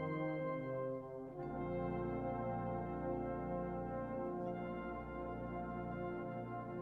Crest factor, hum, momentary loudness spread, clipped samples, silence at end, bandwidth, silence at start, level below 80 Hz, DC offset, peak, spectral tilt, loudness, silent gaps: 12 dB; none; 5 LU; under 0.1%; 0 s; 4.9 kHz; 0 s; -58 dBFS; under 0.1%; -30 dBFS; -10 dB/octave; -43 LUFS; none